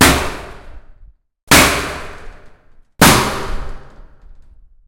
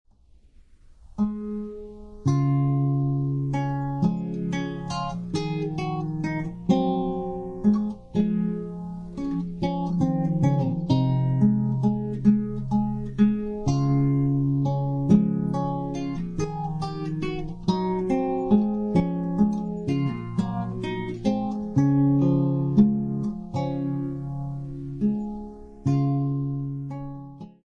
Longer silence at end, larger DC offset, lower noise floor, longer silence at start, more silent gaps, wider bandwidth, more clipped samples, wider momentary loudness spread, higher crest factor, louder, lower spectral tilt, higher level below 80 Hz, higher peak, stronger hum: first, 0.55 s vs 0.15 s; neither; second, -45 dBFS vs -55 dBFS; second, 0 s vs 1.1 s; first, 1.43-1.47 s vs none; first, over 20 kHz vs 7.2 kHz; first, 0.2% vs under 0.1%; first, 24 LU vs 11 LU; about the same, 16 dB vs 18 dB; first, -12 LUFS vs -25 LUFS; second, -3 dB/octave vs -9 dB/octave; first, -30 dBFS vs -46 dBFS; first, 0 dBFS vs -6 dBFS; neither